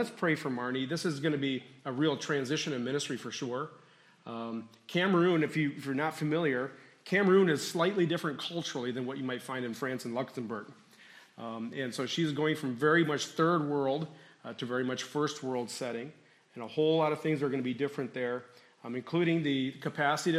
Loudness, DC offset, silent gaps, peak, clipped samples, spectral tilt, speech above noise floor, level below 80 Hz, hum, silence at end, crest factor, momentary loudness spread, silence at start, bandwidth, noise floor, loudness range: -32 LUFS; under 0.1%; none; -12 dBFS; under 0.1%; -5.5 dB/octave; 25 dB; -80 dBFS; none; 0 s; 20 dB; 14 LU; 0 s; 15 kHz; -57 dBFS; 6 LU